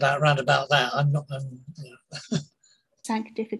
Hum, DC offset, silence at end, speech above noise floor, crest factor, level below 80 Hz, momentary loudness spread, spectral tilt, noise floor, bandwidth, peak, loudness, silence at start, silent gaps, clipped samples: none; under 0.1%; 0 s; 39 dB; 20 dB; -66 dBFS; 21 LU; -5.5 dB/octave; -64 dBFS; 12 kHz; -6 dBFS; -25 LUFS; 0 s; none; under 0.1%